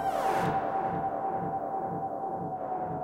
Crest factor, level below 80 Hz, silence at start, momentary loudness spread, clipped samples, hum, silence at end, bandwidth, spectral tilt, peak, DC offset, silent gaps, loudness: 14 dB; -60 dBFS; 0 s; 6 LU; under 0.1%; none; 0 s; 16 kHz; -6.5 dB/octave; -16 dBFS; under 0.1%; none; -32 LUFS